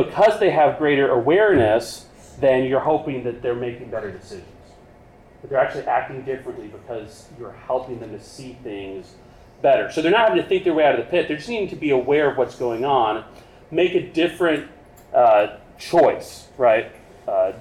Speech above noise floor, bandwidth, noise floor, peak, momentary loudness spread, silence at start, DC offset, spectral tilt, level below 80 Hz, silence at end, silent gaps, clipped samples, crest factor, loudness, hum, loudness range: 28 dB; 13.5 kHz; -48 dBFS; -6 dBFS; 20 LU; 0 s; under 0.1%; -6 dB/octave; -52 dBFS; 0 s; none; under 0.1%; 14 dB; -20 LUFS; none; 8 LU